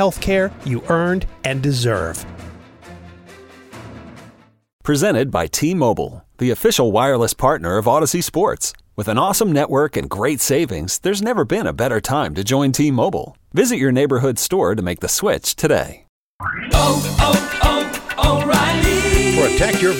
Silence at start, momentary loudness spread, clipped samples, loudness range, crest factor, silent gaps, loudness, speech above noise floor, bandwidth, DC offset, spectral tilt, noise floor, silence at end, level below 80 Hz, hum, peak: 0 s; 9 LU; under 0.1%; 6 LU; 16 dB; 4.73-4.79 s, 16.09-16.39 s; -17 LUFS; 30 dB; 17 kHz; under 0.1%; -4.5 dB/octave; -47 dBFS; 0 s; -30 dBFS; none; -2 dBFS